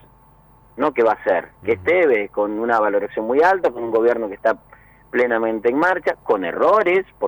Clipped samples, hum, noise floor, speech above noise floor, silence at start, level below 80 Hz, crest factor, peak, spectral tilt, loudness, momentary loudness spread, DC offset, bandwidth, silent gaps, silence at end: under 0.1%; none; -51 dBFS; 32 dB; 0.75 s; -56 dBFS; 12 dB; -6 dBFS; -6.5 dB/octave; -19 LUFS; 6 LU; under 0.1%; over 20 kHz; none; 0 s